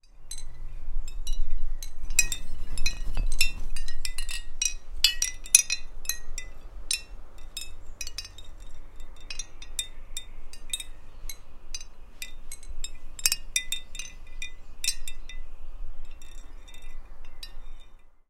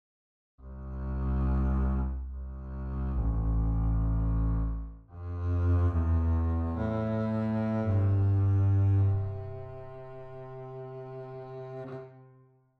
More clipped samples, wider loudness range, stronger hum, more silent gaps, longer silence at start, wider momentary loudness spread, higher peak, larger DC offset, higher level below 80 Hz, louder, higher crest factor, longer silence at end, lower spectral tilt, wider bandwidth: neither; first, 13 LU vs 6 LU; neither; neither; second, 0.15 s vs 0.6 s; first, 24 LU vs 18 LU; first, 0 dBFS vs -18 dBFS; neither; about the same, -32 dBFS vs -34 dBFS; about the same, -30 LUFS vs -30 LUFS; first, 26 dB vs 12 dB; second, 0.2 s vs 0.55 s; second, 0.5 dB/octave vs -11 dB/octave; first, 16 kHz vs 4.1 kHz